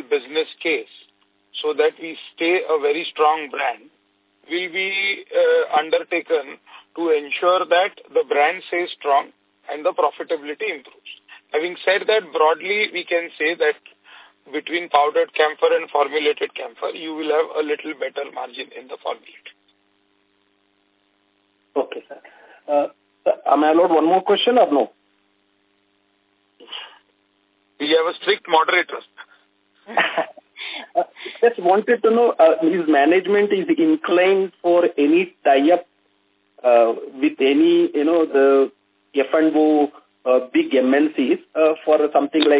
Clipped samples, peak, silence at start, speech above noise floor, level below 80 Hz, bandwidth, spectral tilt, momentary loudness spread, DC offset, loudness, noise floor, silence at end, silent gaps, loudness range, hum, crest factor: under 0.1%; -2 dBFS; 0.1 s; 46 dB; -76 dBFS; 4 kHz; -8 dB/octave; 14 LU; under 0.1%; -19 LUFS; -64 dBFS; 0 s; none; 10 LU; none; 18 dB